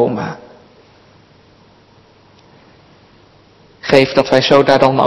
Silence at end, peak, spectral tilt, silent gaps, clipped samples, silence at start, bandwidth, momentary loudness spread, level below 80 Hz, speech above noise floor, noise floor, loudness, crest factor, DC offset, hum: 0 s; 0 dBFS; -5.5 dB/octave; none; 0.4%; 0 s; 12 kHz; 17 LU; -52 dBFS; 36 dB; -47 dBFS; -12 LUFS; 16 dB; under 0.1%; none